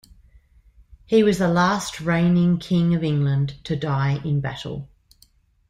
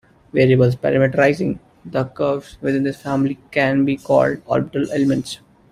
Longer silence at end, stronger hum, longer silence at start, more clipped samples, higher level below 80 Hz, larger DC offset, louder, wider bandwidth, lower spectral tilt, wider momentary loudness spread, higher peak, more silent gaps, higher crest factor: first, 0.85 s vs 0.35 s; neither; first, 1.1 s vs 0.35 s; neither; about the same, -50 dBFS vs -52 dBFS; neither; about the same, -21 LUFS vs -19 LUFS; second, 12 kHz vs 13.5 kHz; about the same, -7 dB/octave vs -7.5 dB/octave; about the same, 9 LU vs 9 LU; second, -6 dBFS vs -2 dBFS; neither; about the same, 16 dB vs 16 dB